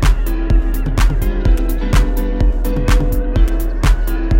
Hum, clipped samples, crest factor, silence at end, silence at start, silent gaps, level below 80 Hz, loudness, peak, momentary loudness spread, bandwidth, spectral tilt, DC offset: none; under 0.1%; 12 dB; 0 s; 0 s; none; -14 dBFS; -17 LUFS; -2 dBFS; 2 LU; 16.5 kHz; -6.5 dB/octave; under 0.1%